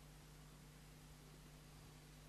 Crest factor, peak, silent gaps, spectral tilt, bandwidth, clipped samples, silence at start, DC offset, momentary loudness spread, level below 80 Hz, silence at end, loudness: 12 dB; -50 dBFS; none; -4.5 dB/octave; 13 kHz; under 0.1%; 0 s; under 0.1%; 1 LU; -66 dBFS; 0 s; -62 LUFS